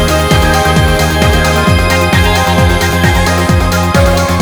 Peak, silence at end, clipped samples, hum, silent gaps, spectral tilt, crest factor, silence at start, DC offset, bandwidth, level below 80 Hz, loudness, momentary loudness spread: 0 dBFS; 0 s; 0.4%; none; none; -5 dB/octave; 8 dB; 0 s; under 0.1%; over 20 kHz; -18 dBFS; -9 LUFS; 1 LU